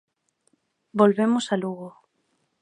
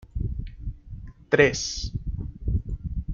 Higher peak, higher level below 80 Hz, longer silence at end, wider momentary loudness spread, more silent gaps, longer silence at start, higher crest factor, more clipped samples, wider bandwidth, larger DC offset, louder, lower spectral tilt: about the same, -4 dBFS vs -4 dBFS; second, -74 dBFS vs -34 dBFS; first, 0.7 s vs 0 s; second, 18 LU vs 21 LU; neither; first, 0.95 s vs 0 s; about the same, 22 dB vs 22 dB; neither; first, 10.5 kHz vs 7.6 kHz; neither; first, -23 LUFS vs -26 LUFS; first, -6 dB/octave vs -4.5 dB/octave